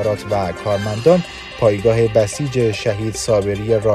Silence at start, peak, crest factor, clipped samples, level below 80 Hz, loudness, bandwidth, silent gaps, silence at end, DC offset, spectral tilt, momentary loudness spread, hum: 0 s; 0 dBFS; 16 dB; under 0.1%; -40 dBFS; -17 LUFS; 14 kHz; none; 0 s; under 0.1%; -6 dB/octave; 6 LU; none